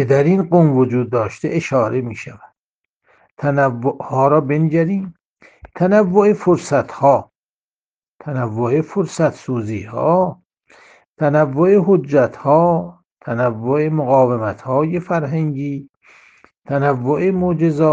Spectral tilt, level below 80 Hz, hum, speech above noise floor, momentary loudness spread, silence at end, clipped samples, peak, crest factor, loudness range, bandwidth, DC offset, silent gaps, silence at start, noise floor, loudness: -8.5 dB/octave; -56 dBFS; none; over 74 dB; 10 LU; 0 s; under 0.1%; 0 dBFS; 16 dB; 4 LU; 9.2 kHz; under 0.1%; 2.60-3.00 s, 3.31-3.37 s, 5.25-5.35 s, 7.35-8.02 s, 8.10-8.19 s, 11.08-11.16 s, 13.12-13.17 s, 15.89-16.01 s; 0 s; under -90 dBFS; -17 LUFS